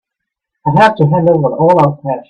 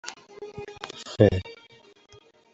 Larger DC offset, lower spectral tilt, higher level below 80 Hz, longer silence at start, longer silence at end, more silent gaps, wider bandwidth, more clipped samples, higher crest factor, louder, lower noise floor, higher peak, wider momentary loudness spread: neither; first, -8.5 dB/octave vs -6.5 dB/octave; about the same, -50 dBFS vs -54 dBFS; first, 0.65 s vs 0.05 s; second, 0.1 s vs 1 s; neither; about the same, 8.8 kHz vs 8 kHz; neither; second, 12 dB vs 26 dB; first, -11 LUFS vs -23 LUFS; first, -78 dBFS vs -54 dBFS; first, 0 dBFS vs -4 dBFS; second, 5 LU vs 22 LU